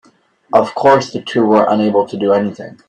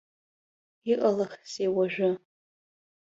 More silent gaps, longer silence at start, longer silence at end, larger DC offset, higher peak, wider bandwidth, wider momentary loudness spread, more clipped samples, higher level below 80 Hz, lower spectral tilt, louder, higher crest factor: neither; second, 0.5 s vs 0.85 s; second, 0.15 s vs 0.85 s; neither; first, 0 dBFS vs -12 dBFS; first, 9.8 kHz vs 7.8 kHz; second, 5 LU vs 10 LU; neither; first, -58 dBFS vs -74 dBFS; about the same, -6 dB/octave vs -6 dB/octave; first, -14 LUFS vs -28 LUFS; about the same, 14 dB vs 18 dB